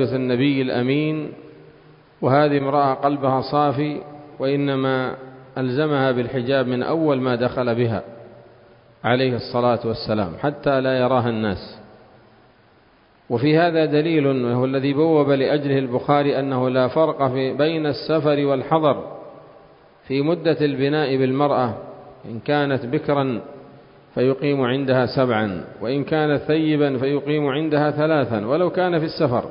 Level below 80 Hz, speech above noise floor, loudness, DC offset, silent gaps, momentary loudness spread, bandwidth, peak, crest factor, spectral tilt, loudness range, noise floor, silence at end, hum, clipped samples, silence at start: -54 dBFS; 35 dB; -20 LUFS; under 0.1%; none; 9 LU; 5.4 kHz; -2 dBFS; 18 dB; -11.5 dB/octave; 3 LU; -54 dBFS; 0 s; none; under 0.1%; 0 s